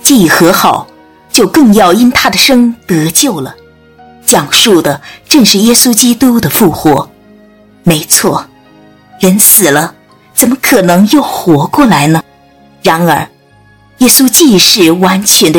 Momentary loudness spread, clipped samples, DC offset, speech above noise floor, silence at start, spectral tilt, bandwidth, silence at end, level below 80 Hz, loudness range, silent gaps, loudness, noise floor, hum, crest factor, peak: 10 LU; 7%; under 0.1%; 36 dB; 0.05 s; -3.5 dB/octave; over 20 kHz; 0 s; -40 dBFS; 2 LU; none; -6 LUFS; -42 dBFS; none; 8 dB; 0 dBFS